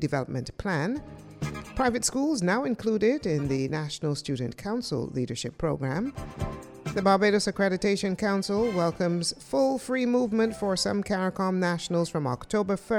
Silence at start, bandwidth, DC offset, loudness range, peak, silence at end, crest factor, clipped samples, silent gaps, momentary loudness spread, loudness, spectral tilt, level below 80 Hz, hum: 0 s; 15 kHz; under 0.1%; 4 LU; -8 dBFS; 0 s; 18 dB; under 0.1%; none; 9 LU; -28 LUFS; -5 dB/octave; -50 dBFS; none